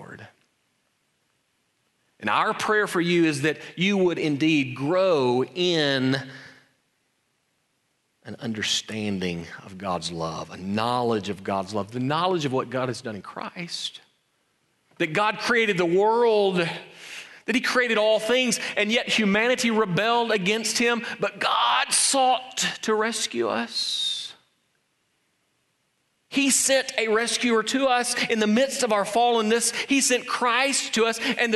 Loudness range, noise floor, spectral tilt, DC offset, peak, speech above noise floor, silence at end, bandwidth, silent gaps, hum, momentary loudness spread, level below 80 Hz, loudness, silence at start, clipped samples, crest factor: 7 LU; -72 dBFS; -3 dB/octave; under 0.1%; -8 dBFS; 48 dB; 0 s; 12 kHz; none; none; 11 LU; -68 dBFS; -23 LUFS; 0 s; under 0.1%; 16 dB